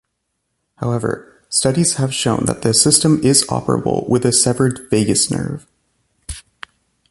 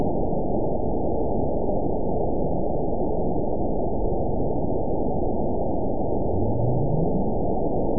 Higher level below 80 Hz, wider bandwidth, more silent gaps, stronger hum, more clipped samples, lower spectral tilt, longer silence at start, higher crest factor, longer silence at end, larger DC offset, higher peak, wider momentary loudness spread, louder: second, -44 dBFS vs -32 dBFS; first, 12 kHz vs 1 kHz; neither; neither; neither; second, -4 dB/octave vs -18.5 dB/octave; first, 0.8 s vs 0 s; first, 18 dB vs 12 dB; first, 0.7 s vs 0 s; second, under 0.1% vs 6%; first, 0 dBFS vs -10 dBFS; first, 16 LU vs 2 LU; first, -15 LUFS vs -26 LUFS